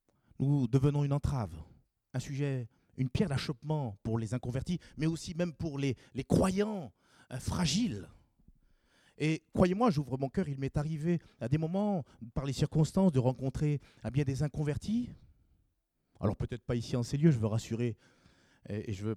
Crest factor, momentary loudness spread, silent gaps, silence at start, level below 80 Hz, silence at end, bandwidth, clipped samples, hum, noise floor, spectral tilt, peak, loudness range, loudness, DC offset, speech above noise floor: 22 dB; 12 LU; none; 0.4 s; -52 dBFS; 0 s; 13 kHz; under 0.1%; none; -78 dBFS; -7 dB/octave; -12 dBFS; 4 LU; -33 LUFS; under 0.1%; 46 dB